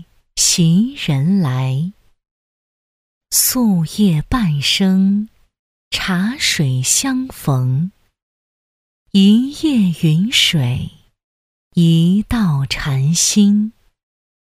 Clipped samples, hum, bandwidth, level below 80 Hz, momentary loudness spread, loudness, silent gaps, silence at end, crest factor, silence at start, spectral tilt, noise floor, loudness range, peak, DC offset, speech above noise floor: under 0.1%; none; 16 kHz; -40 dBFS; 9 LU; -15 LUFS; 2.31-3.21 s, 5.59-5.91 s, 8.22-9.06 s, 11.24-11.71 s; 0.85 s; 14 dB; 0.35 s; -4 dB/octave; under -90 dBFS; 2 LU; -2 dBFS; under 0.1%; over 76 dB